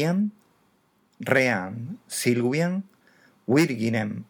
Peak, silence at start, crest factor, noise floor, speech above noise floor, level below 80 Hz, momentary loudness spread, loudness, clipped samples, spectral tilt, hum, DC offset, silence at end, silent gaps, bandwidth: -4 dBFS; 0 s; 20 dB; -65 dBFS; 41 dB; -76 dBFS; 13 LU; -24 LUFS; under 0.1%; -5.5 dB/octave; none; under 0.1%; 0.05 s; none; 19.5 kHz